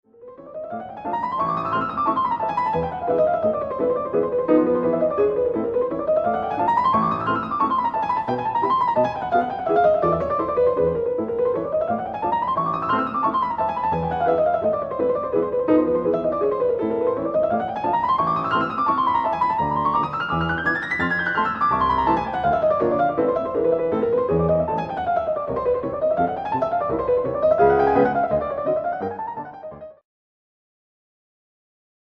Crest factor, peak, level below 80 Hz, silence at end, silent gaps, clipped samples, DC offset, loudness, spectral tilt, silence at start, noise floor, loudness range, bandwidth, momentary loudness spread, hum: 16 dB; -4 dBFS; -48 dBFS; 2.1 s; none; under 0.1%; under 0.1%; -21 LUFS; -8.5 dB/octave; 0.2 s; -42 dBFS; 2 LU; 6.4 kHz; 5 LU; none